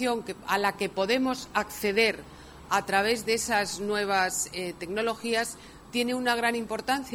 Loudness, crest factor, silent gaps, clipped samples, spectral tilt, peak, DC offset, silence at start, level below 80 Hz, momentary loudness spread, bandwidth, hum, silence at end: -27 LUFS; 18 dB; none; under 0.1%; -2.5 dB/octave; -10 dBFS; under 0.1%; 0 s; -56 dBFS; 8 LU; 17.5 kHz; none; 0 s